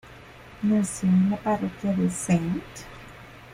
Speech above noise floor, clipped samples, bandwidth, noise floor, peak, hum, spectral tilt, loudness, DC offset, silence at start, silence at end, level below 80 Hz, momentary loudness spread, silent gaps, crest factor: 22 dB; under 0.1%; 14.5 kHz; -46 dBFS; -12 dBFS; none; -6.5 dB/octave; -25 LUFS; under 0.1%; 0.05 s; 0 s; -52 dBFS; 22 LU; none; 14 dB